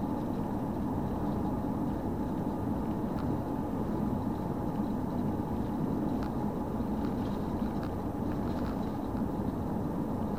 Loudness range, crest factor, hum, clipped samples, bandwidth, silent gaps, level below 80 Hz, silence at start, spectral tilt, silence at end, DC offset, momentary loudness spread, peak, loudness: 1 LU; 14 dB; none; under 0.1%; 16 kHz; none; -46 dBFS; 0 s; -9 dB/octave; 0 s; 0.3%; 1 LU; -18 dBFS; -34 LUFS